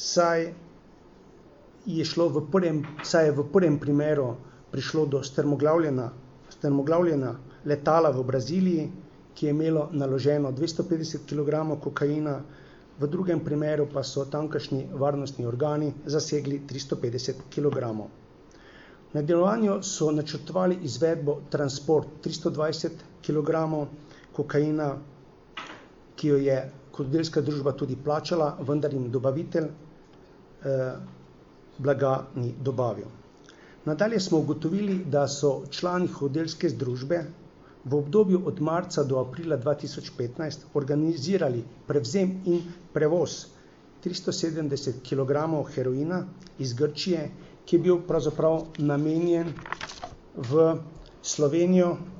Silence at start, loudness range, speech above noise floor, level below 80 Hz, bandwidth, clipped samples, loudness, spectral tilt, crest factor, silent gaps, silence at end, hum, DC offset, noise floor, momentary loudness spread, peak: 0 s; 4 LU; 26 dB; -58 dBFS; 8 kHz; under 0.1%; -27 LUFS; -6 dB/octave; 18 dB; none; 0 s; none; under 0.1%; -52 dBFS; 13 LU; -8 dBFS